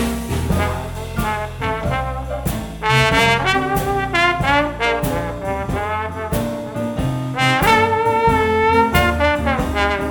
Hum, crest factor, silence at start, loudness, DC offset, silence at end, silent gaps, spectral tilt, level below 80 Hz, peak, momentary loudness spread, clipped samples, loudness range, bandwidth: none; 18 dB; 0 s; -18 LUFS; under 0.1%; 0 s; none; -5 dB/octave; -32 dBFS; 0 dBFS; 10 LU; under 0.1%; 4 LU; over 20 kHz